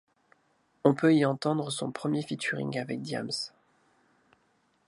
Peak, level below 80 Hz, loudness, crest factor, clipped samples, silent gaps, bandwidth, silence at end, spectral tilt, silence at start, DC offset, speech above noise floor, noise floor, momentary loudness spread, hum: -6 dBFS; -76 dBFS; -29 LUFS; 24 dB; under 0.1%; none; 11.5 kHz; 1.4 s; -5.5 dB/octave; 0.85 s; under 0.1%; 42 dB; -70 dBFS; 11 LU; none